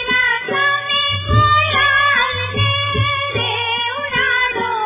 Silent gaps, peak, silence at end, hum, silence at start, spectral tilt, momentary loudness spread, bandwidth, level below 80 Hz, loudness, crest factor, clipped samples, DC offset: none; -2 dBFS; 0 s; none; 0 s; -7.5 dB/octave; 5 LU; 3.9 kHz; -34 dBFS; -15 LUFS; 14 dB; under 0.1%; under 0.1%